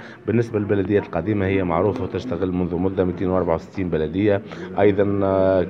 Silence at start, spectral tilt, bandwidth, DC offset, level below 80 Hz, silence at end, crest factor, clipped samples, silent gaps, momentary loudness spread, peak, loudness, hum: 0 s; -9 dB/octave; 7.2 kHz; under 0.1%; -46 dBFS; 0 s; 16 dB; under 0.1%; none; 6 LU; -4 dBFS; -21 LUFS; none